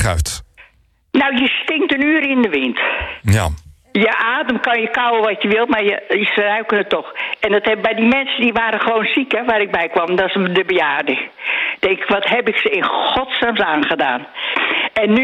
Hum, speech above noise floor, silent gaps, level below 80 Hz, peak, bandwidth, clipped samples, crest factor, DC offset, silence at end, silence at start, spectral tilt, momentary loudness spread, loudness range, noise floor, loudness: none; 37 dB; none; -40 dBFS; -4 dBFS; 14 kHz; under 0.1%; 12 dB; under 0.1%; 0 s; 0 s; -5 dB/octave; 6 LU; 1 LU; -54 dBFS; -16 LUFS